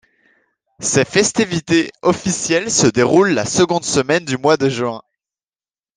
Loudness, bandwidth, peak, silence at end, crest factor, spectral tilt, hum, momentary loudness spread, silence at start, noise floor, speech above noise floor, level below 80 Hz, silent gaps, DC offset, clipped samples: -16 LUFS; 10.5 kHz; 0 dBFS; 0.95 s; 16 dB; -4 dB/octave; none; 6 LU; 0.8 s; under -90 dBFS; over 74 dB; -54 dBFS; none; under 0.1%; under 0.1%